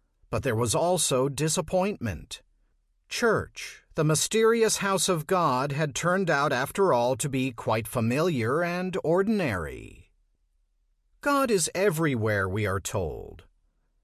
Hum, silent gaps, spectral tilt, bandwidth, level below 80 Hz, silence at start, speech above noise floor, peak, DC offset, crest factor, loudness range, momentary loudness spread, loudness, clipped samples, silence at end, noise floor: none; none; -4.5 dB/octave; 14.5 kHz; -50 dBFS; 0.3 s; 44 dB; -12 dBFS; under 0.1%; 14 dB; 4 LU; 11 LU; -26 LUFS; under 0.1%; 0.6 s; -70 dBFS